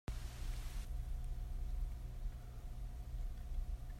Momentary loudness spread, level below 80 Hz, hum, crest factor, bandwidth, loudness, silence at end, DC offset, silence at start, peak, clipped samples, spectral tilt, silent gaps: 4 LU; -44 dBFS; none; 12 dB; 15 kHz; -49 LUFS; 0 s; under 0.1%; 0.1 s; -30 dBFS; under 0.1%; -5.5 dB/octave; none